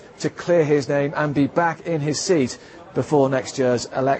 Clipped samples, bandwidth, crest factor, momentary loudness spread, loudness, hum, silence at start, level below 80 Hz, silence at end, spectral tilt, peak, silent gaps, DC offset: under 0.1%; 8.6 kHz; 16 dB; 9 LU; -21 LUFS; none; 0 s; -58 dBFS; 0 s; -5.5 dB/octave; -4 dBFS; none; under 0.1%